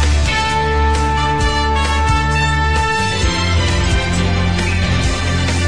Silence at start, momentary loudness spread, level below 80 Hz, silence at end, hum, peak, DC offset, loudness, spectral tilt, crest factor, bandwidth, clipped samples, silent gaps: 0 s; 2 LU; -20 dBFS; 0 s; none; -4 dBFS; 3%; -15 LUFS; -4.5 dB/octave; 12 dB; 10.5 kHz; under 0.1%; none